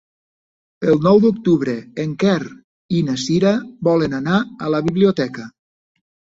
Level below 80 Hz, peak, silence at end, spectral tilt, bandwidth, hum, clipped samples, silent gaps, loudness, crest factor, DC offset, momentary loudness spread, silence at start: -54 dBFS; -2 dBFS; 0.9 s; -7 dB/octave; 7.8 kHz; none; under 0.1%; 2.64-2.89 s; -18 LUFS; 16 dB; under 0.1%; 11 LU; 0.8 s